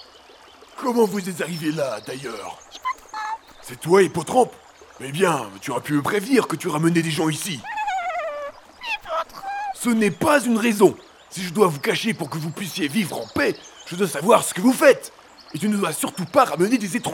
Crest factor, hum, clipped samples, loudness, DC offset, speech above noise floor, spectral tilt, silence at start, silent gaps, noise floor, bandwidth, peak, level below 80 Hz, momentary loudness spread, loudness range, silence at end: 20 dB; none; under 0.1%; -22 LUFS; under 0.1%; 27 dB; -4.5 dB/octave; 0.75 s; none; -48 dBFS; 18 kHz; -2 dBFS; -60 dBFS; 14 LU; 5 LU; 0 s